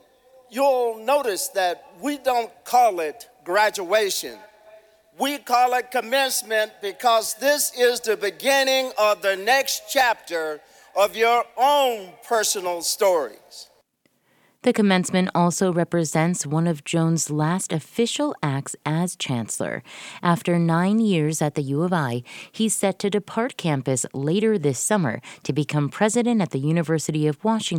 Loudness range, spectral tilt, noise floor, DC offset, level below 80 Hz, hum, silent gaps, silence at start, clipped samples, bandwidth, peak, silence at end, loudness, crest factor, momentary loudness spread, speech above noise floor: 3 LU; -4.5 dB/octave; -66 dBFS; under 0.1%; -68 dBFS; none; none; 0.5 s; under 0.1%; 19 kHz; -4 dBFS; 0 s; -22 LUFS; 20 dB; 8 LU; 45 dB